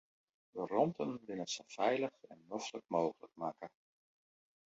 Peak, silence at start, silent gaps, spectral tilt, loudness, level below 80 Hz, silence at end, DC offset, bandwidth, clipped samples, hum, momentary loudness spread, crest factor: -18 dBFS; 0.55 s; none; -4 dB/octave; -39 LUFS; -84 dBFS; 1 s; under 0.1%; 7.6 kHz; under 0.1%; none; 12 LU; 22 dB